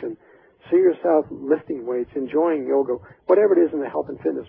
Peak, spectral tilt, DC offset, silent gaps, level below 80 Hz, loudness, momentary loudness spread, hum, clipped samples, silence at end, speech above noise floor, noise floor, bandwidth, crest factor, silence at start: -4 dBFS; -11.5 dB/octave; under 0.1%; none; -62 dBFS; -21 LUFS; 10 LU; none; under 0.1%; 0.05 s; 32 dB; -53 dBFS; 3.6 kHz; 16 dB; 0 s